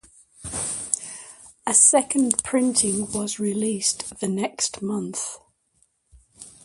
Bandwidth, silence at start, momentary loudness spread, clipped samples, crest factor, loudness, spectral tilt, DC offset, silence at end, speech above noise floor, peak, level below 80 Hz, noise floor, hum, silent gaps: 11.5 kHz; 0.4 s; 18 LU; under 0.1%; 24 dB; -22 LUFS; -3 dB/octave; under 0.1%; 0.15 s; 44 dB; 0 dBFS; -56 dBFS; -66 dBFS; none; none